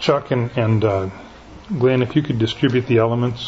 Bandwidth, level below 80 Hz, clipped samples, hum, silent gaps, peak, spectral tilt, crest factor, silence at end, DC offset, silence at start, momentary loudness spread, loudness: 7.8 kHz; -48 dBFS; under 0.1%; none; none; -4 dBFS; -7.5 dB/octave; 16 dB; 0 s; under 0.1%; 0 s; 8 LU; -19 LUFS